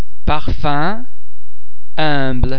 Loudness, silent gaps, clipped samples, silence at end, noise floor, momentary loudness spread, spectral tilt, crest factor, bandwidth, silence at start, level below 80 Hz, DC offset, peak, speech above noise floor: -20 LUFS; none; under 0.1%; 0 s; -51 dBFS; 9 LU; -8 dB/octave; 20 dB; 5.4 kHz; 0 s; -24 dBFS; 40%; 0 dBFS; 36 dB